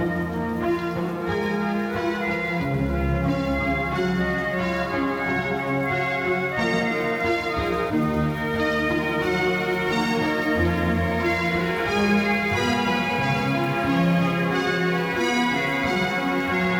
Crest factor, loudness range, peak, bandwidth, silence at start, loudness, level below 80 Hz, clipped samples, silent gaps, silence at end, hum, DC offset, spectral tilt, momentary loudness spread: 14 dB; 2 LU; -8 dBFS; 18 kHz; 0 s; -23 LUFS; -40 dBFS; under 0.1%; none; 0 s; none; under 0.1%; -6 dB/octave; 3 LU